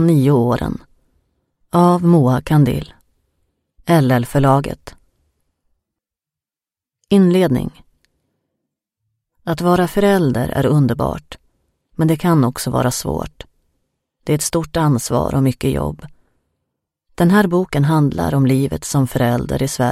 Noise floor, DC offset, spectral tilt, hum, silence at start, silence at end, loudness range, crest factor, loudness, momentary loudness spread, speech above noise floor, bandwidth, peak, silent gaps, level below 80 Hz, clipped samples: under -90 dBFS; under 0.1%; -6.5 dB/octave; none; 0 s; 0 s; 4 LU; 18 dB; -16 LUFS; 13 LU; over 75 dB; 16 kHz; 0 dBFS; none; -40 dBFS; under 0.1%